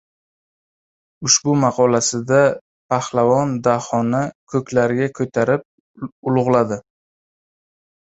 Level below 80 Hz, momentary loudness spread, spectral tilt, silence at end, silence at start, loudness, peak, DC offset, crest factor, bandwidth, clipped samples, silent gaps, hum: -58 dBFS; 10 LU; -4.5 dB/octave; 1.2 s; 1.2 s; -18 LUFS; -2 dBFS; under 0.1%; 18 dB; 8.2 kHz; under 0.1%; 2.61-2.89 s, 4.35-4.47 s, 5.65-5.94 s, 6.12-6.23 s; none